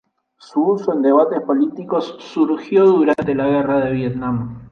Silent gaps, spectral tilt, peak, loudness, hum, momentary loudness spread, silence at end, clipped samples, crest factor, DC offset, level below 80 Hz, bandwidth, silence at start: none; -8.5 dB/octave; -2 dBFS; -17 LUFS; none; 9 LU; 0.05 s; under 0.1%; 14 dB; under 0.1%; -52 dBFS; 6.8 kHz; 0.55 s